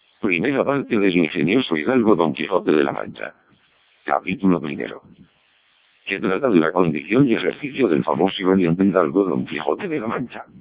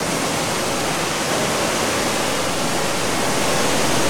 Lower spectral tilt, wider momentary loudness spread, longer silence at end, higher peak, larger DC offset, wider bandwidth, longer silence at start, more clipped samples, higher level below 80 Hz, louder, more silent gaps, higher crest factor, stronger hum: first, -10.5 dB/octave vs -2.5 dB/octave; first, 12 LU vs 2 LU; about the same, 0 s vs 0 s; first, -2 dBFS vs -6 dBFS; neither; second, 4 kHz vs 18 kHz; first, 0.25 s vs 0 s; neither; second, -56 dBFS vs -46 dBFS; about the same, -20 LUFS vs -19 LUFS; neither; about the same, 18 dB vs 14 dB; neither